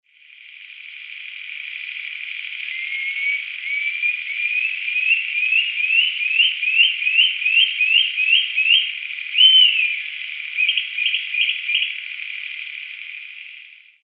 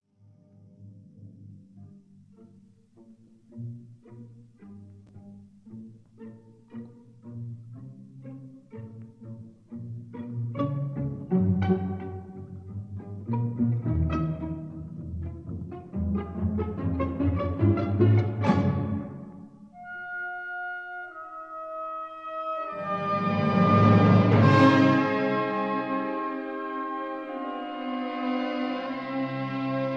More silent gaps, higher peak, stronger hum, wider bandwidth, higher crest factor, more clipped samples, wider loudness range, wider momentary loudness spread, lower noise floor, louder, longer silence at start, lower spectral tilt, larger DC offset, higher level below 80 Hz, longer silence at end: neither; first, -2 dBFS vs -6 dBFS; neither; second, 5.2 kHz vs 6.8 kHz; about the same, 18 dB vs 22 dB; neither; second, 10 LU vs 26 LU; second, 17 LU vs 24 LU; second, -46 dBFS vs -58 dBFS; first, -17 LUFS vs -27 LUFS; second, 0.4 s vs 0.8 s; second, 4.5 dB/octave vs -9 dB/octave; neither; second, under -90 dBFS vs -48 dBFS; first, 0.35 s vs 0 s